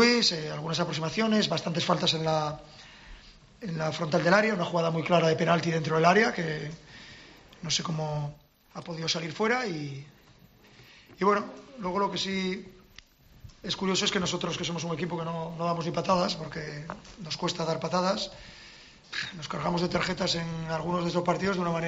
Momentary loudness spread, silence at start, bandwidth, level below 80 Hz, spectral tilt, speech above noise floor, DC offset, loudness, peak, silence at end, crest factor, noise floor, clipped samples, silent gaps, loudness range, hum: 18 LU; 0 s; 8 kHz; -58 dBFS; -4.5 dB/octave; 28 dB; under 0.1%; -28 LUFS; -8 dBFS; 0 s; 22 dB; -57 dBFS; under 0.1%; none; 7 LU; none